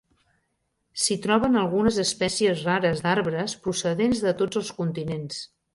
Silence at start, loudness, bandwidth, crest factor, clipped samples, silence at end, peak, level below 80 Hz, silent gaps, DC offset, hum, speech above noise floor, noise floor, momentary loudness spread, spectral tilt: 0.95 s; -24 LUFS; 11.5 kHz; 18 dB; under 0.1%; 0.3 s; -8 dBFS; -54 dBFS; none; under 0.1%; none; 51 dB; -75 dBFS; 9 LU; -4.5 dB/octave